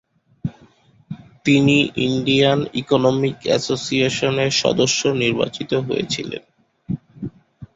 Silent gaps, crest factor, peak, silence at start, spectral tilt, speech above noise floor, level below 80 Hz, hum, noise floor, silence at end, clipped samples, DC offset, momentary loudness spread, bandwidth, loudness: none; 18 dB; -2 dBFS; 0.45 s; -4.5 dB/octave; 34 dB; -52 dBFS; none; -52 dBFS; 0.1 s; under 0.1%; under 0.1%; 16 LU; 8 kHz; -18 LUFS